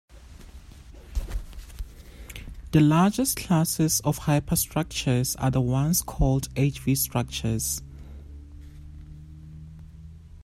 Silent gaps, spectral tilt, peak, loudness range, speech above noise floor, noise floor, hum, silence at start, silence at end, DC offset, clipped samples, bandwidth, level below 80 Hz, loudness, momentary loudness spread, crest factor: none; -5 dB/octave; -8 dBFS; 7 LU; 22 dB; -46 dBFS; none; 0.15 s; 0 s; under 0.1%; under 0.1%; 16 kHz; -38 dBFS; -24 LUFS; 23 LU; 18 dB